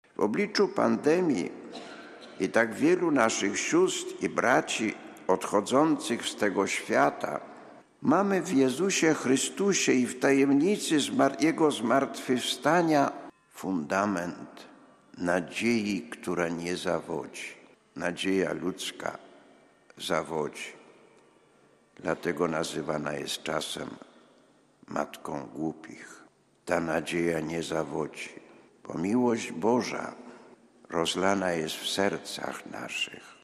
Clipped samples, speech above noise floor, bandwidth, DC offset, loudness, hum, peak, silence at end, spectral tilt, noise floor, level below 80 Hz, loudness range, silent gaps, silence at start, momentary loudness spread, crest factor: under 0.1%; 34 dB; 13.5 kHz; under 0.1%; -28 LUFS; none; -8 dBFS; 0.1 s; -4 dB/octave; -62 dBFS; -68 dBFS; 9 LU; none; 0.2 s; 15 LU; 20 dB